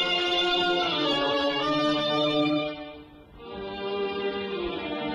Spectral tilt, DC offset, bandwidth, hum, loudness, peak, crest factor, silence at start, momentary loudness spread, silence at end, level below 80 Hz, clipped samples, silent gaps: -4.5 dB/octave; under 0.1%; 11.5 kHz; none; -26 LUFS; -14 dBFS; 14 dB; 0 s; 16 LU; 0 s; -56 dBFS; under 0.1%; none